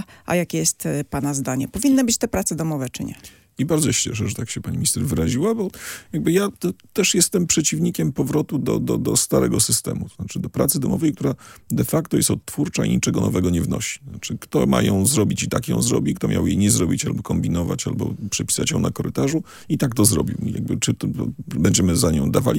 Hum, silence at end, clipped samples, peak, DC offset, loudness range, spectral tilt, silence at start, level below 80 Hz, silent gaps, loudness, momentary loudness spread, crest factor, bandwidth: none; 0 s; under 0.1%; -2 dBFS; under 0.1%; 3 LU; -4.5 dB/octave; 0 s; -44 dBFS; none; -21 LUFS; 10 LU; 20 dB; 17 kHz